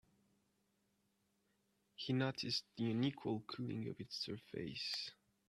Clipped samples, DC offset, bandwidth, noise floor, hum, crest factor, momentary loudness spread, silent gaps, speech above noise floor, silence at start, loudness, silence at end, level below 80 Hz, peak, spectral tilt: under 0.1%; under 0.1%; 13 kHz; -82 dBFS; none; 20 dB; 8 LU; none; 39 dB; 2 s; -43 LUFS; 0.35 s; -80 dBFS; -24 dBFS; -5.5 dB/octave